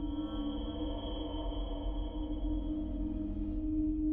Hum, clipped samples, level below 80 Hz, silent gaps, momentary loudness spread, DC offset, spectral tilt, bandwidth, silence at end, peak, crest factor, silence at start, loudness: none; under 0.1%; -40 dBFS; none; 5 LU; under 0.1%; -10.5 dB/octave; 3.6 kHz; 0 s; -24 dBFS; 12 dB; 0 s; -38 LUFS